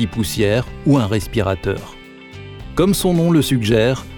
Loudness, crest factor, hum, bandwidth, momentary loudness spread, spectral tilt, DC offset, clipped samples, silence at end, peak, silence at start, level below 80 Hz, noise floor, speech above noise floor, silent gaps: -17 LUFS; 14 dB; none; over 20 kHz; 20 LU; -6 dB/octave; under 0.1%; under 0.1%; 0 s; -2 dBFS; 0 s; -36 dBFS; -37 dBFS; 20 dB; none